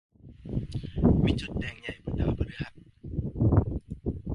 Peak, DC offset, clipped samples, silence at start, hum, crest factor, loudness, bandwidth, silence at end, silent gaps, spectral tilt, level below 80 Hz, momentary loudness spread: -8 dBFS; under 0.1%; under 0.1%; 0.25 s; none; 20 dB; -30 LUFS; 11 kHz; 0 s; none; -8.5 dB/octave; -36 dBFS; 14 LU